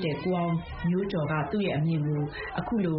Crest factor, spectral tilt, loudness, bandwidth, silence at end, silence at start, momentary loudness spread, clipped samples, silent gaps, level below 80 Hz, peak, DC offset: 12 dB; -6.5 dB/octave; -29 LUFS; 5.4 kHz; 0 s; 0 s; 4 LU; under 0.1%; none; -50 dBFS; -16 dBFS; under 0.1%